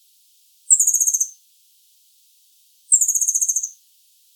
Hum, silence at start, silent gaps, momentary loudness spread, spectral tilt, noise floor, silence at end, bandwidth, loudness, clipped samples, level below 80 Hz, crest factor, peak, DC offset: none; 0.7 s; none; 10 LU; 11 dB/octave; -57 dBFS; 0.65 s; 19 kHz; -16 LUFS; under 0.1%; under -90 dBFS; 22 dB; 0 dBFS; under 0.1%